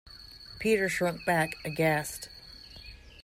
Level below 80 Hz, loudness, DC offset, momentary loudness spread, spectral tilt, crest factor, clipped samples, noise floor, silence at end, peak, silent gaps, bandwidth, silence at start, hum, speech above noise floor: -56 dBFS; -29 LUFS; under 0.1%; 20 LU; -4.5 dB/octave; 18 dB; under 0.1%; -49 dBFS; 0 s; -14 dBFS; none; 16 kHz; 0.05 s; none; 20 dB